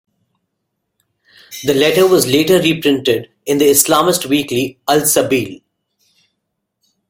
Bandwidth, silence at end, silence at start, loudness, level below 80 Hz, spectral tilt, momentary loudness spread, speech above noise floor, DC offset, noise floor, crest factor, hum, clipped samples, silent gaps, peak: 17 kHz; 1.55 s; 1.5 s; -13 LUFS; -52 dBFS; -3.5 dB/octave; 9 LU; 60 dB; under 0.1%; -73 dBFS; 16 dB; none; under 0.1%; none; 0 dBFS